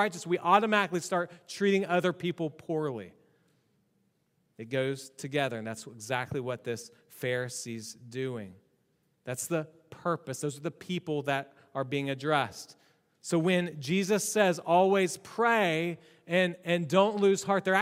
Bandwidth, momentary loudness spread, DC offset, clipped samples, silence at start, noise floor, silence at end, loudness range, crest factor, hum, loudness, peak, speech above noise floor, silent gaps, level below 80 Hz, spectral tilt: 16 kHz; 15 LU; under 0.1%; under 0.1%; 0 s; -74 dBFS; 0 s; 10 LU; 22 dB; none; -30 LUFS; -8 dBFS; 44 dB; none; -76 dBFS; -4.5 dB/octave